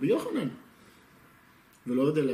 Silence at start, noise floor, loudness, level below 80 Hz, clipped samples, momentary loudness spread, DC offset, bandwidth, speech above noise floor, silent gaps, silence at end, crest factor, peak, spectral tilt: 0 s; -59 dBFS; -29 LUFS; -72 dBFS; under 0.1%; 18 LU; under 0.1%; 15 kHz; 31 dB; none; 0 s; 16 dB; -14 dBFS; -7.5 dB/octave